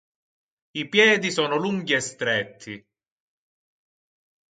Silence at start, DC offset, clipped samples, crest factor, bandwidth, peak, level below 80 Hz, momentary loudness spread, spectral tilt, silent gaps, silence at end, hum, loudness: 0.75 s; under 0.1%; under 0.1%; 22 dB; 9.4 kHz; -4 dBFS; -72 dBFS; 21 LU; -3.5 dB/octave; none; 1.75 s; none; -22 LUFS